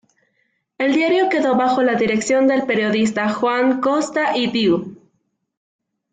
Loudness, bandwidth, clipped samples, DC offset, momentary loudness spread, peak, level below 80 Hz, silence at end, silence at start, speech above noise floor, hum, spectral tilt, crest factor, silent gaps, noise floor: -18 LUFS; 9.4 kHz; under 0.1%; under 0.1%; 3 LU; -6 dBFS; -60 dBFS; 1.2 s; 0.8 s; 52 dB; none; -4.5 dB/octave; 12 dB; none; -69 dBFS